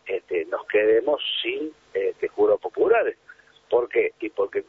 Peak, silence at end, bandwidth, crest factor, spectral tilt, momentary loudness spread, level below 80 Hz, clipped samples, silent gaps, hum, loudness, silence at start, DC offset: -6 dBFS; 0.05 s; 4.2 kHz; 16 dB; -5 dB/octave; 8 LU; -64 dBFS; under 0.1%; none; none; -24 LUFS; 0.05 s; under 0.1%